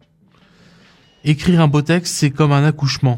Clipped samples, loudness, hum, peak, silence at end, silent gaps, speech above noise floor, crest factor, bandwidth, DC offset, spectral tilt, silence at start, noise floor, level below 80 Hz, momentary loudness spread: under 0.1%; -16 LUFS; none; -2 dBFS; 0 s; none; 38 dB; 16 dB; 16 kHz; under 0.1%; -6 dB/octave; 1.25 s; -53 dBFS; -44 dBFS; 5 LU